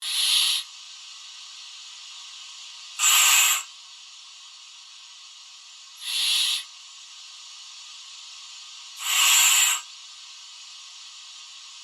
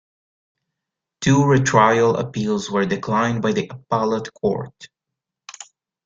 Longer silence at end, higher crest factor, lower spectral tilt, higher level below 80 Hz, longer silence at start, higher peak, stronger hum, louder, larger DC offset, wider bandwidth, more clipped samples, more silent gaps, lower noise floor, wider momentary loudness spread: second, 0 s vs 0.4 s; about the same, 22 dB vs 20 dB; second, 9 dB/octave vs -6 dB/octave; second, -82 dBFS vs -54 dBFS; second, 0 s vs 1.2 s; second, -6 dBFS vs -2 dBFS; neither; about the same, -19 LUFS vs -19 LUFS; neither; first, over 20 kHz vs 7.8 kHz; neither; neither; second, -46 dBFS vs -84 dBFS; first, 26 LU vs 13 LU